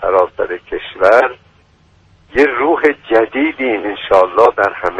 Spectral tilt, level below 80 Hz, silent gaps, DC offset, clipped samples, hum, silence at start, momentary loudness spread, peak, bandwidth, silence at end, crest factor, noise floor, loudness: -5.5 dB/octave; -46 dBFS; none; under 0.1%; under 0.1%; none; 0 s; 10 LU; 0 dBFS; 9 kHz; 0 s; 14 dB; -50 dBFS; -13 LUFS